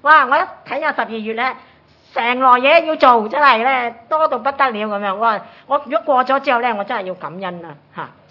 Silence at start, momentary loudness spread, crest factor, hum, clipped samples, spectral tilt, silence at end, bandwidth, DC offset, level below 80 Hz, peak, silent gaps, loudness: 0.05 s; 16 LU; 16 dB; none; under 0.1%; -6 dB/octave; 0.25 s; 6 kHz; under 0.1%; -66 dBFS; 0 dBFS; none; -16 LUFS